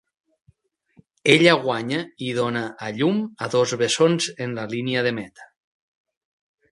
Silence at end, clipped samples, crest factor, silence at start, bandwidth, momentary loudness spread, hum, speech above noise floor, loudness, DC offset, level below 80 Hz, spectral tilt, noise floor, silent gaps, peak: 1.25 s; under 0.1%; 24 dB; 1.25 s; 11.5 kHz; 12 LU; none; 40 dB; -21 LUFS; under 0.1%; -66 dBFS; -4.5 dB/octave; -62 dBFS; none; 0 dBFS